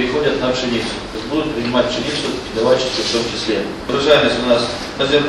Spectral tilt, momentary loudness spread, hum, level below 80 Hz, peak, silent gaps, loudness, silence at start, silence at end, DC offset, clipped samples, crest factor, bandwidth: -4 dB/octave; 8 LU; none; -40 dBFS; 0 dBFS; none; -17 LUFS; 0 s; 0 s; under 0.1%; under 0.1%; 18 dB; 12 kHz